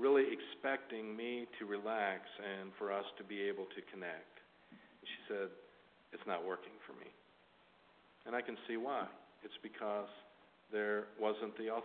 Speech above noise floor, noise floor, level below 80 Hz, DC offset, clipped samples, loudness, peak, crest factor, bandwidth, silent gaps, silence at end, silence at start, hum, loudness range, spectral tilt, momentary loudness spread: 26 dB; -69 dBFS; -88 dBFS; under 0.1%; under 0.1%; -42 LUFS; -22 dBFS; 20 dB; 4.4 kHz; none; 0 s; 0 s; none; 6 LU; -2 dB/octave; 18 LU